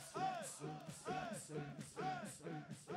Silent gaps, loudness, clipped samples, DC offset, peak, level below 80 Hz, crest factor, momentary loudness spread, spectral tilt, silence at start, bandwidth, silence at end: none; -48 LUFS; under 0.1%; under 0.1%; -32 dBFS; -78 dBFS; 16 dB; 7 LU; -4.5 dB/octave; 0 s; 16 kHz; 0 s